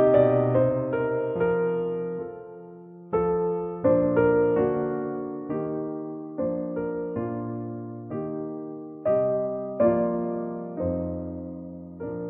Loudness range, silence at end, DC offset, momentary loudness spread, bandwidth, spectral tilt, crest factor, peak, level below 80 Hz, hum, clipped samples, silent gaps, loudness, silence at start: 6 LU; 0 s; under 0.1%; 15 LU; 3.8 kHz; -9 dB/octave; 18 dB; -8 dBFS; -54 dBFS; none; under 0.1%; none; -26 LUFS; 0 s